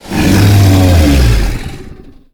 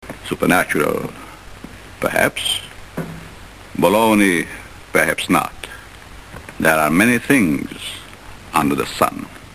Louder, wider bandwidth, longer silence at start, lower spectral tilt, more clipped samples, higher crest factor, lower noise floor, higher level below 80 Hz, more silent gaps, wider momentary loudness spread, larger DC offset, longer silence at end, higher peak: first, -9 LUFS vs -17 LUFS; first, 19.5 kHz vs 14 kHz; about the same, 0.05 s vs 0 s; first, -6 dB/octave vs -4 dB/octave; neither; second, 8 dB vs 20 dB; second, -32 dBFS vs -38 dBFS; first, -16 dBFS vs -44 dBFS; neither; second, 14 LU vs 23 LU; second, under 0.1% vs 0.3%; first, 0.4 s vs 0 s; about the same, 0 dBFS vs 0 dBFS